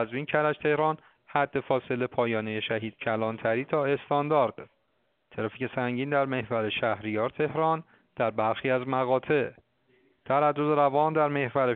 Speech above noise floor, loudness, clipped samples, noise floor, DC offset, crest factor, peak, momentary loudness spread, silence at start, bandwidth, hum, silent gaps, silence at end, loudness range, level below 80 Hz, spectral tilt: 47 dB; -28 LUFS; under 0.1%; -74 dBFS; under 0.1%; 20 dB; -8 dBFS; 7 LU; 0 s; 4.5 kHz; none; none; 0 s; 3 LU; -68 dBFS; -4.5 dB/octave